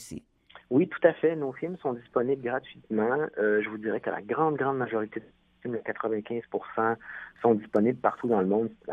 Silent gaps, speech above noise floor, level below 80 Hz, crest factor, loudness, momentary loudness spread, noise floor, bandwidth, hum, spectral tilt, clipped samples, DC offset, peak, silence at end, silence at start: none; 28 dB; -70 dBFS; 22 dB; -28 LUFS; 10 LU; -56 dBFS; 11 kHz; none; -7.5 dB/octave; under 0.1%; under 0.1%; -6 dBFS; 0 s; 0 s